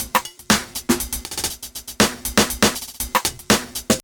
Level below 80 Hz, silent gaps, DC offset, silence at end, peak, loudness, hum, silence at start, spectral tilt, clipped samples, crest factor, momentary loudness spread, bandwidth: -40 dBFS; none; under 0.1%; 0.05 s; -2 dBFS; -20 LUFS; none; 0 s; -2.5 dB/octave; under 0.1%; 20 dB; 8 LU; over 20 kHz